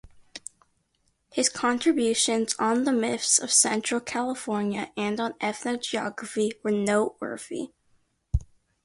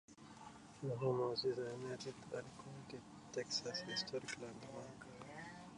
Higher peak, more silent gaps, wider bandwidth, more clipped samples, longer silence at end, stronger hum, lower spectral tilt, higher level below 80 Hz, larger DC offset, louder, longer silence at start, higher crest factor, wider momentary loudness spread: first, -6 dBFS vs -28 dBFS; neither; about the same, 11.5 kHz vs 11 kHz; neither; first, 0.4 s vs 0 s; neither; second, -3 dB/octave vs -4.5 dB/octave; first, -44 dBFS vs -76 dBFS; neither; first, -25 LUFS vs -45 LUFS; about the same, 0.05 s vs 0.1 s; about the same, 22 dB vs 18 dB; about the same, 14 LU vs 16 LU